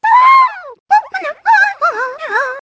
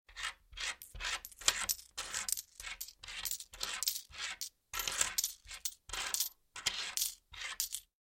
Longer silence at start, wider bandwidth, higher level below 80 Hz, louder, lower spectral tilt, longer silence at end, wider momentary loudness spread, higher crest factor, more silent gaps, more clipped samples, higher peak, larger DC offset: about the same, 0.05 s vs 0.1 s; second, 8 kHz vs 17 kHz; about the same, -64 dBFS vs -60 dBFS; first, -12 LUFS vs -38 LUFS; first, -0.5 dB/octave vs 2 dB/octave; second, 0.05 s vs 0.25 s; first, 13 LU vs 10 LU; second, 12 dB vs 34 dB; first, 0.80-0.86 s vs none; neither; first, 0 dBFS vs -8 dBFS; neither